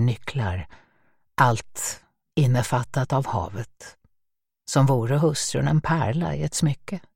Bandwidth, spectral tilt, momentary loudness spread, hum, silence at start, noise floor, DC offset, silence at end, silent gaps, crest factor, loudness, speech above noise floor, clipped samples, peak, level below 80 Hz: 16.5 kHz; -5.5 dB/octave; 13 LU; none; 0 s; -78 dBFS; under 0.1%; 0.15 s; none; 20 dB; -24 LUFS; 55 dB; under 0.1%; -4 dBFS; -50 dBFS